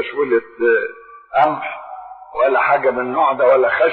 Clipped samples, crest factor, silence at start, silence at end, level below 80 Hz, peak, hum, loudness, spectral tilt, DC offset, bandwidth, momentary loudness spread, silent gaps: under 0.1%; 14 dB; 0 s; 0 s; -58 dBFS; -4 dBFS; none; -16 LUFS; -7.5 dB/octave; under 0.1%; 4.5 kHz; 16 LU; none